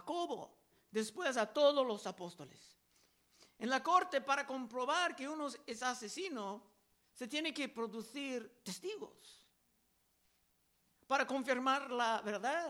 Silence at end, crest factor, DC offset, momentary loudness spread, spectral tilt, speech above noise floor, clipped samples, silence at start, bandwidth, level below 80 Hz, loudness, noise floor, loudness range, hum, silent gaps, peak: 0 s; 22 dB; under 0.1%; 15 LU; -3 dB/octave; 39 dB; under 0.1%; 0 s; 16.5 kHz; -86 dBFS; -38 LUFS; -77 dBFS; 7 LU; none; none; -18 dBFS